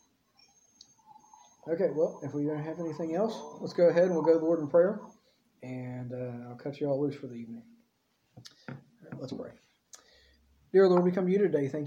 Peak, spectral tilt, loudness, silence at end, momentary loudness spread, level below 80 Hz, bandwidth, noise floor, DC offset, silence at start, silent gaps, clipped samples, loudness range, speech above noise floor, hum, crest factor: -12 dBFS; -8 dB/octave; -29 LUFS; 0 s; 23 LU; -76 dBFS; 7.8 kHz; -74 dBFS; under 0.1%; 1.65 s; none; under 0.1%; 11 LU; 45 dB; none; 18 dB